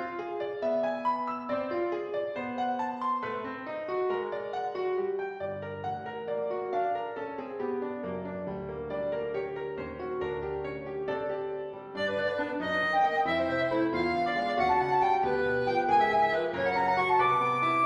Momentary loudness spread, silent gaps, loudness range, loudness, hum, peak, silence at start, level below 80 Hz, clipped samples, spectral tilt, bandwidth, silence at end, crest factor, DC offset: 11 LU; none; 8 LU; -30 LUFS; none; -14 dBFS; 0 s; -60 dBFS; under 0.1%; -6.5 dB/octave; 11 kHz; 0 s; 16 dB; under 0.1%